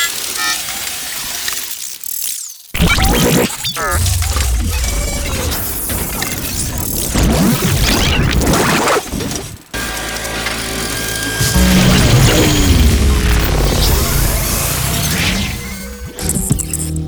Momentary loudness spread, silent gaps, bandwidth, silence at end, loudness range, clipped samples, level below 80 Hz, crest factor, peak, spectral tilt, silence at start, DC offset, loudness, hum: 9 LU; none; over 20 kHz; 0 s; 5 LU; under 0.1%; -20 dBFS; 14 dB; 0 dBFS; -3.5 dB/octave; 0 s; under 0.1%; -15 LUFS; none